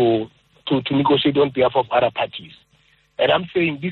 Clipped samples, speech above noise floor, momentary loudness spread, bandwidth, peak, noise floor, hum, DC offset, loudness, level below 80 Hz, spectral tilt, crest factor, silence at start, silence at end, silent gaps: under 0.1%; 40 dB; 17 LU; 4.4 kHz; -4 dBFS; -59 dBFS; none; under 0.1%; -19 LUFS; -56 dBFS; -8.5 dB/octave; 16 dB; 0 s; 0 s; none